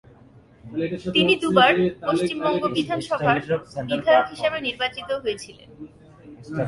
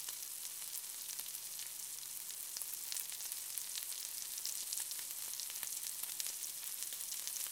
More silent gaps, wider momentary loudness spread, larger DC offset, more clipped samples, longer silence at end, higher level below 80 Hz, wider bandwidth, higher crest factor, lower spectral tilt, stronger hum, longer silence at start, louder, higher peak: neither; first, 12 LU vs 3 LU; neither; neither; about the same, 0 s vs 0 s; first, -56 dBFS vs under -90 dBFS; second, 11.5 kHz vs 19 kHz; second, 20 dB vs 32 dB; first, -5.5 dB/octave vs 3 dB/octave; neither; first, 0.65 s vs 0 s; first, -22 LUFS vs -41 LUFS; first, -2 dBFS vs -14 dBFS